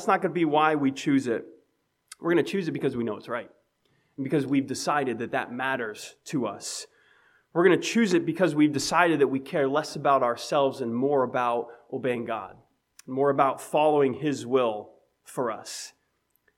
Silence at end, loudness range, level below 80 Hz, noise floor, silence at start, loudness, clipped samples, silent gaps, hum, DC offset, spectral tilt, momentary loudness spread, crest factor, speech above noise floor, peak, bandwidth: 0.7 s; 5 LU; -70 dBFS; -73 dBFS; 0 s; -26 LUFS; under 0.1%; none; none; under 0.1%; -5 dB/octave; 13 LU; 20 dB; 47 dB; -6 dBFS; 15.5 kHz